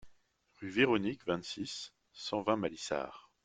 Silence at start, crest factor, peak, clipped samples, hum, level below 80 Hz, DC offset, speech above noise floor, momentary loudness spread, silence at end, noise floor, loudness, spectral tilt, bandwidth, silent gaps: 0 s; 22 dB; -14 dBFS; under 0.1%; none; -70 dBFS; under 0.1%; 35 dB; 15 LU; 0.25 s; -69 dBFS; -35 LUFS; -4.5 dB/octave; 9.4 kHz; none